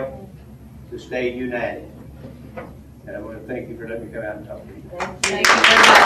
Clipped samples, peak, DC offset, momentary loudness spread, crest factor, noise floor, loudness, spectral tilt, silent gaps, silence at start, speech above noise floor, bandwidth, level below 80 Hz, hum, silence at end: under 0.1%; 0 dBFS; under 0.1%; 27 LU; 20 dB; -41 dBFS; -17 LUFS; -2 dB/octave; none; 0 s; 22 dB; 15.5 kHz; -46 dBFS; none; 0 s